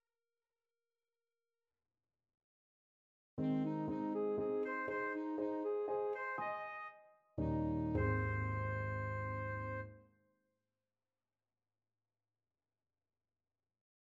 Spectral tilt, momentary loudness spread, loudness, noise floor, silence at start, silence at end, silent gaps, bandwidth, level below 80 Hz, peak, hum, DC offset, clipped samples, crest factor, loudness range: -10 dB/octave; 9 LU; -40 LUFS; under -90 dBFS; 3.35 s; 4 s; none; 7 kHz; -58 dBFS; -26 dBFS; none; under 0.1%; under 0.1%; 18 dB; 8 LU